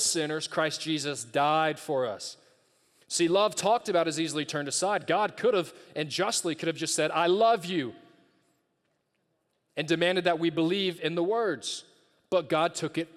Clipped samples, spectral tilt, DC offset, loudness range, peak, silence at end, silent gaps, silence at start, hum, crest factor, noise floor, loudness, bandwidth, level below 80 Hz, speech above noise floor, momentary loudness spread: under 0.1%; -3.5 dB/octave; under 0.1%; 3 LU; -12 dBFS; 0.1 s; none; 0 s; none; 18 dB; -76 dBFS; -28 LUFS; 14.5 kHz; -78 dBFS; 48 dB; 9 LU